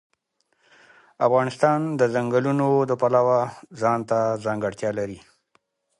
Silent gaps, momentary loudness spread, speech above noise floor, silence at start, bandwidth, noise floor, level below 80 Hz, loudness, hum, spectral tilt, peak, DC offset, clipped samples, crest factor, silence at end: none; 8 LU; 49 dB; 1.2 s; 11.5 kHz; -71 dBFS; -64 dBFS; -22 LUFS; none; -7 dB/octave; -4 dBFS; under 0.1%; under 0.1%; 18 dB; 0.8 s